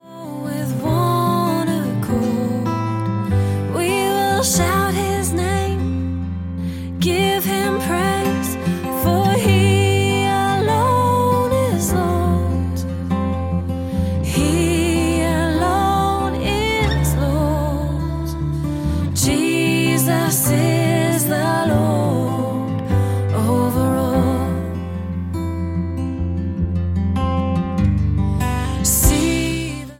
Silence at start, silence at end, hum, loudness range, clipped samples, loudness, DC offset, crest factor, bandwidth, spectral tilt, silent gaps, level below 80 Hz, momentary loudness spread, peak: 0.05 s; 0.05 s; none; 4 LU; under 0.1%; -19 LUFS; under 0.1%; 18 dB; 16.5 kHz; -5.5 dB/octave; none; -30 dBFS; 7 LU; 0 dBFS